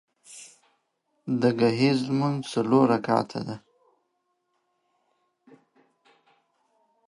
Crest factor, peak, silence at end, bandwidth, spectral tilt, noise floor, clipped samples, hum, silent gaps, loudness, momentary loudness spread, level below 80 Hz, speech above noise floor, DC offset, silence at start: 22 dB; -6 dBFS; 3.5 s; 11.5 kHz; -6.5 dB/octave; -76 dBFS; under 0.1%; none; none; -24 LUFS; 23 LU; -70 dBFS; 52 dB; under 0.1%; 0.3 s